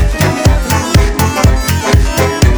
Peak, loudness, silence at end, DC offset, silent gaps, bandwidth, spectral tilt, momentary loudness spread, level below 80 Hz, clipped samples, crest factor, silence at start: 0 dBFS; -11 LUFS; 0 s; under 0.1%; none; over 20 kHz; -5 dB/octave; 2 LU; -14 dBFS; under 0.1%; 10 dB; 0 s